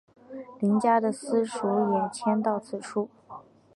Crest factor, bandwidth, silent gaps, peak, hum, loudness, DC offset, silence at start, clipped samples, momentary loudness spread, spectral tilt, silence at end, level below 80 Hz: 18 dB; 11.5 kHz; none; -10 dBFS; none; -27 LUFS; under 0.1%; 0.3 s; under 0.1%; 21 LU; -6.5 dB/octave; 0.35 s; -74 dBFS